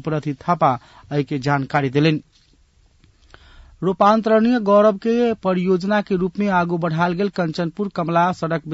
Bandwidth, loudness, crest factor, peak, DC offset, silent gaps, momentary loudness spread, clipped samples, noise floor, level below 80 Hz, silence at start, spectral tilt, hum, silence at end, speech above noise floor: 8 kHz; -19 LUFS; 16 dB; -4 dBFS; under 0.1%; none; 9 LU; under 0.1%; -56 dBFS; -54 dBFS; 0.05 s; -7.5 dB/octave; none; 0 s; 37 dB